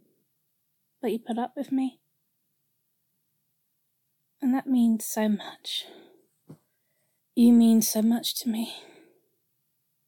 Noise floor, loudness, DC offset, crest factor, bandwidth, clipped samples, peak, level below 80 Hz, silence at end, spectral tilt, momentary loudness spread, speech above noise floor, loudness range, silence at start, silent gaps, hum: -76 dBFS; -25 LUFS; under 0.1%; 18 dB; 17.5 kHz; under 0.1%; -10 dBFS; -86 dBFS; 1.3 s; -4.5 dB/octave; 15 LU; 51 dB; 10 LU; 1.05 s; none; none